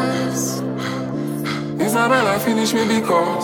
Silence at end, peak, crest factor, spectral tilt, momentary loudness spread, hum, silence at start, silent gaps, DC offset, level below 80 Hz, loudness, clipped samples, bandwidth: 0 s; -4 dBFS; 14 dB; -4.5 dB/octave; 8 LU; none; 0 s; none; under 0.1%; -56 dBFS; -19 LUFS; under 0.1%; 19 kHz